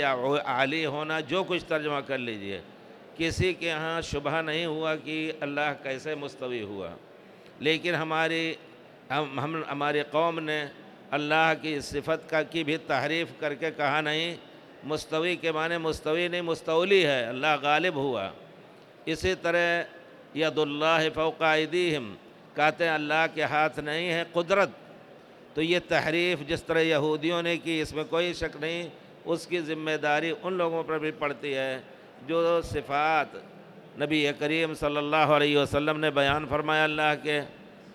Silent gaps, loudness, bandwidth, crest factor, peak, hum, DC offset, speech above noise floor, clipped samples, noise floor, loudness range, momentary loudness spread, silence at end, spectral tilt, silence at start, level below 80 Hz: none; -27 LUFS; 15 kHz; 20 dB; -8 dBFS; none; under 0.1%; 24 dB; under 0.1%; -51 dBFS; 4 LU; 10 LU; 0 s; -5 dB/octave; 0 s; -56 dBFS